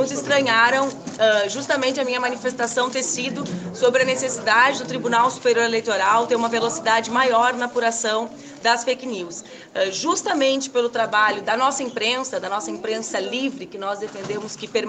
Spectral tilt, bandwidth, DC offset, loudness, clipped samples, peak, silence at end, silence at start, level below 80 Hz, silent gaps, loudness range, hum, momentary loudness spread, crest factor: -2.5 dB/octave; 9.4 kHz; under 0.1%; -21 LUFS; under 0.1%; -2 dBFS; 0 s; 0 s; -68 dBFS; none; 4 LU; none; 11 LU; 18 dB